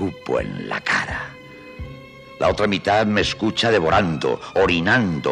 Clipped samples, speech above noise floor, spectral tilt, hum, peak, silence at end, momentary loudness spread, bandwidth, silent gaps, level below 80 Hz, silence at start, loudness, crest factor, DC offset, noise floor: under 0.1%; 20 dB; -5 dB/octave; none; -6 dBFS; 0 s; 19 LU; 11.5 kHz; none; -42 dBFS; 0 s; -20 LUFS; 16 dB; under 0.1%; -40 dBFS